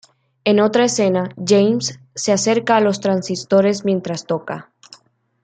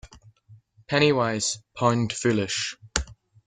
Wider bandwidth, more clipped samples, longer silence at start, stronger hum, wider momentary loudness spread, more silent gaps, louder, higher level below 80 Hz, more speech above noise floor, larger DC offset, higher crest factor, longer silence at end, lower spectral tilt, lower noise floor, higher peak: about the same, 9.4 kHz vs 9.6 kHz; neither; first, 0.45 s vs 0.05 s; neither; about the same, 9 LU vs 9 LU; neither; first, -17 LUFS vs -24 LUFS; second, -64 dBFS vs -46 dBFS; first, 36 dB vs 30 dB; neither; second, 16 dB vs 24 dB; first, 0.8 s vs 0.35 s; about the same, -4.5 dB/octave vs -4 dB/octave; about the same, -53 dBFS vs -54 dBFS; about the same, -2 dBFS vs -2 dBFS